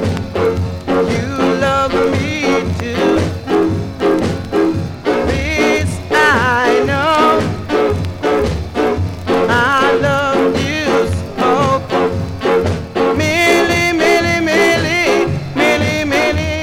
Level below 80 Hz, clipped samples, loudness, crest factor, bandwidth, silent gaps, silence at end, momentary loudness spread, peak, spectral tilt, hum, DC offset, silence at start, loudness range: -34 dBFS; under 0.1%; -14 LUFS; 14 dB; 16.5 kHz; none; 0 s; 6 LU; 0 dBFS; -5.5 dB/octave; none; under 0.1%; 0 s; 3 LU